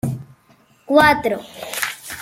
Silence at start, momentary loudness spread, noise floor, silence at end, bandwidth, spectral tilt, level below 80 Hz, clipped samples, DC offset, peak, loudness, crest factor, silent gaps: 0.05 s; 15 LU; -54 dBFS; 0 s; 16.5 kHz; -4.5 dB/octave; -50 dBFS; under 0.1%; under 0.1%; -2 dBFS; -18 LUFS; 18 dB; none